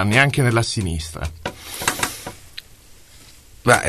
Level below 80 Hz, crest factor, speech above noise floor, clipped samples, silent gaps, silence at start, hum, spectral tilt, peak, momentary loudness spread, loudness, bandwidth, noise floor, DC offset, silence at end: -40 dBFS; 22 dB; 27 dB; under 0.1%; none; 0 s; none; -4 dB/octave; 0 dBFS; 20 LU; -21 LUFS; 13.5 kHz; -46 dBFS; 0.2%; 0 s